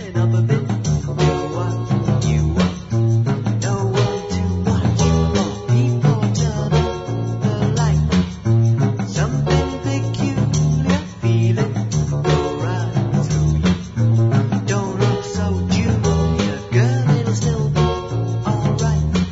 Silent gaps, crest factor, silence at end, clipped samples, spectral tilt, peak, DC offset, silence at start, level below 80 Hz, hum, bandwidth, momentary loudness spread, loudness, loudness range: none; 14 dB; 0 s; under 0.1%; -6.5 dB/octave; -4 dBFS; under 0.1%; 0 s; -32 dBFS; none; 7.8 kHz; 5 LU; -18 LUFS; 1 LU